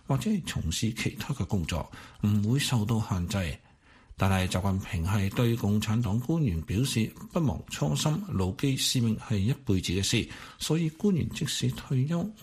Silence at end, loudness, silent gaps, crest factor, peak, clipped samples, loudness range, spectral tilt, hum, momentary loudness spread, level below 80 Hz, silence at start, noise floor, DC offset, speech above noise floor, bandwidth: 0 s; -29 LUFS; none; 18 dB; -10 dBFS; under 0.1%; 1 LU; -5.5 dB/octave; none; 6 LU; -46 dBFS; 0.1 s; -54 dBFS; under 0.1%; 26 dB; 15.5 kHz